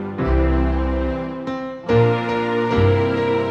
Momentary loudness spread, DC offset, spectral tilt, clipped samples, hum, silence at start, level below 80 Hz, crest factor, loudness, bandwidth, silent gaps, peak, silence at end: 10 LU; under 0.1%; -8.5 dB/octave; under 0.1%; none; 0 s; -26 dBFS; 14 dB; -20 LUFS; 7 kHz; none; -4 dBFS; 0 s